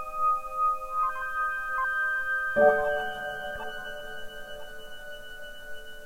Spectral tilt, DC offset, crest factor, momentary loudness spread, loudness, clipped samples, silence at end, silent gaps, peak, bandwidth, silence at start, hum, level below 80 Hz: -3.5 dB/octave; under 0.1%; 20 dB; 20 LU; -28 LUFS; under 0.1%; 0 s; none; -8 dBFS; 16 kHz; 0 s; none; -50 dBFS